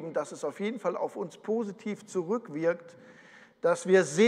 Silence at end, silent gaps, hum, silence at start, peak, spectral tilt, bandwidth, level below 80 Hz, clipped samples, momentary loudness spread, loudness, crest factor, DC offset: 0 s; none; none; 0 s; -10 dBFS; -5 dB/octave; 11.5 kHz; -86 dBFS; under 0.1%; 12 LU; -31 LUFS; 20 dB; under 0.1%